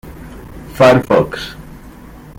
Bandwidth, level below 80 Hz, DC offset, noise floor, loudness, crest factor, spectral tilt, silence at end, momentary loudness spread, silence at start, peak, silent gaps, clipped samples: 16.5 kHz; -38 dBFS; under 0.1%; -36 dBFS; -12 LUFS; 16 dB; -6.5 dB/octave; 0.5 s; 24 LU; 0.05 s; 0 dBFS; none; under 0.1%